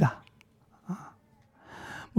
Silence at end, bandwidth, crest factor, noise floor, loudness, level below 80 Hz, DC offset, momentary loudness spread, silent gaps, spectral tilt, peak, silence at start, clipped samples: 0 s; 12.5 kHz; 22 dB; -62 dBFS; -37 LUFS; -64 dBFS; under 0.1%; 20 LU; none; -8 dB/octave; -12 dBFS; 0 s; under 0.1%